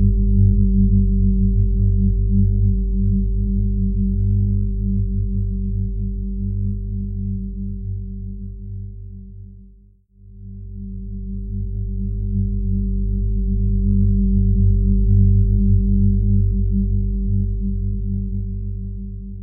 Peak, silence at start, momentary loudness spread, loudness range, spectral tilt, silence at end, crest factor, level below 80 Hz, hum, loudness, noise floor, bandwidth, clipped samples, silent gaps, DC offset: -4 dBFS; 0 s; 16 LU; 14 LU; -21 dB/octave; 0 s; 14 dB; -20 dBFS; 50 Hz at -40 dBFS; -20 LUFS; -49 dBFS; 0.4 kHz; under 0.1%; none; under 0.1%